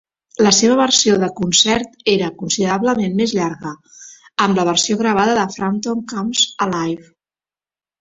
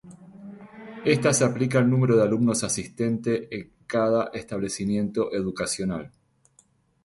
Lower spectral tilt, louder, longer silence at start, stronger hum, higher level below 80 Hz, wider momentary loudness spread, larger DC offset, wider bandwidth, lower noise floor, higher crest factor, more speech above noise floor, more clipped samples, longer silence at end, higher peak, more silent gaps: second, -3 dB/octave vs -5.5 dB/octave; first, -16 LUFS vs -24 LUFS; first, 0.4 s vs 0.05 s; neither; about the same, -54 dBFS vs -56 dBFS; second, 11 LU vs 18 LU; neither; second, 8.2 kHz vs 11.5 kHz; first, under -90 dBFS vs -62 dBFS; about the same, 16 dB vs 18 dB; first, over 73 dB vs 39 dB; neither; about the same, 1 s vs 0.95 s; first, 0 dBFS vs -8 dBFS; neither